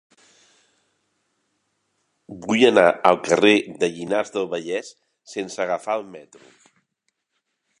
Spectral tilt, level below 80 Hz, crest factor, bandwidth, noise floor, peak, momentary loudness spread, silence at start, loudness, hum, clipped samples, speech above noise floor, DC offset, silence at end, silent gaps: -4 dB/octave; -66 dBFS; 24 dB; 11 kHz; -76 dBFS; 0 dBFS; 19 LU; 2.3 s; -20 LUFS; none; under 0.1%; 55 dB; under 0.1%; 1.6 s; none